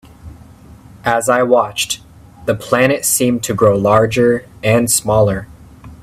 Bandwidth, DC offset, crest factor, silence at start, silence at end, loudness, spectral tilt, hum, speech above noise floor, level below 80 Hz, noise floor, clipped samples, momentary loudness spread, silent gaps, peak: 16 kHz; under 0.1%; 16 dB; 0.25 s; 0.1 s; -14 LUFS; -4 dB/octave; none; 26 dB; -44 dBFS; -40 dBFS; under 0.1%; 9 LU; none; 0 dBFS